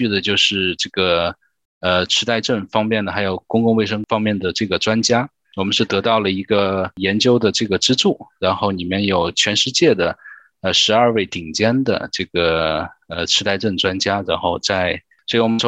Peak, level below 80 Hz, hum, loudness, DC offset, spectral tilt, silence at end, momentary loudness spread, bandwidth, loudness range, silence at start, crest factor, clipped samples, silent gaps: -2 dBFS; -54 dBFS; none; -17 LUFS; under 0.1%; -4 dB/octave; 0 s; 7 LU; 9.8 kHz; 2 LU; 0 s; 16 dB; under 0.1%; 1.65-1.81 s